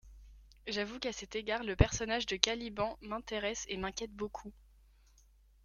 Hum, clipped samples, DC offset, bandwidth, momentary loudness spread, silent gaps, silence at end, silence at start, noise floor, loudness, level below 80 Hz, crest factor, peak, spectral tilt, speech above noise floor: none; under 0.1%; under 0.1%; 13.5 kHz; 12 LU; none; 1.1 s; 0.05 s; -64 dBFS; -36 LUFS; -48 dBFS; 34 dB; -2 dBFS; -3.5 dB/octave; 28 dB